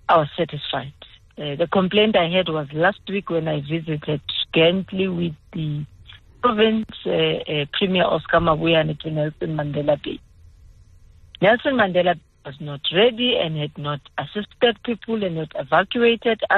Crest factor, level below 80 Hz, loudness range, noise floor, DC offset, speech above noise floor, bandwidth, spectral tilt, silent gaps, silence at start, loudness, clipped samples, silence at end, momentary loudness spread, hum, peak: 16 dB; -50 dBFS; 3 LU; -49 dBFS; under 0.1%; 28 dB; 4.4 kHz; -8 dB/octave; none; 0.1 s; -21 LUFS; under 0.1%; 0 s; 11 LU; none; -4 dBFS